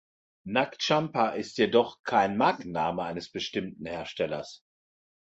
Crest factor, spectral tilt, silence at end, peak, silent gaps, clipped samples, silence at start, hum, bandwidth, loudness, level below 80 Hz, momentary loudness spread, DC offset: 22 dB; -5 dB/octave; 0.65 s; -8 dBFS; 1.99-2.04 s; under 0.1%; 0.45 s; none; 8.2 kHz; -28 LUFS; -64 dBFS; 12 LU; under 0.1%